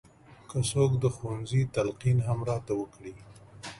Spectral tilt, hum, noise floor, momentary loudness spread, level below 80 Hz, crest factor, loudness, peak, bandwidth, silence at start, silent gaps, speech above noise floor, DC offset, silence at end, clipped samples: -6.5 dB/octave; none; -51 dBFS; 15 LU; -54 dBFS; 18 dB; -29 LUFS; -12 dBFS; 11.5 kHz; 0.3 s; none; 23 dB; under 0.1%; 0 s; under 0.1%